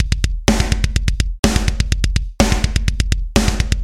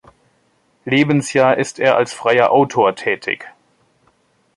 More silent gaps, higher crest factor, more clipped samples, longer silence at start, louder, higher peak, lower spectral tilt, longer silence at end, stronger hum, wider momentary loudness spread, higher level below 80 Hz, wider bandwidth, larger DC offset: first, 1.39-1.43 s vs none; about the same, 16 dB vs 16 dB; neither; second, 0 s vs 0.85 s; about the same, -18 LUFS vs -16 LUFS; about the same, 0 dBFS vs -2 dBFS; about the same, -4.5 dB/octave vs -5 dB/octave; second, 0 s vs 1.05 s; neither; second, 3 LU vs 9 LU; first, -18 dBFS vs -62 dBFS; first, 15.5 kHz vs 11.5 kHz; first, 1% vs under 0.1%